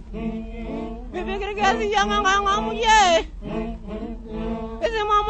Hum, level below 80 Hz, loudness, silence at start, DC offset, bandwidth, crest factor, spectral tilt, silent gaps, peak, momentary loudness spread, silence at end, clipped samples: none; -36 dBFS; -22 LUFS; 0 s; under 0.1%; 8.4 kHz; 20 dB; -3 dB/octave; none; -4 dBFS; 16 LU; 0 s; under 0.1%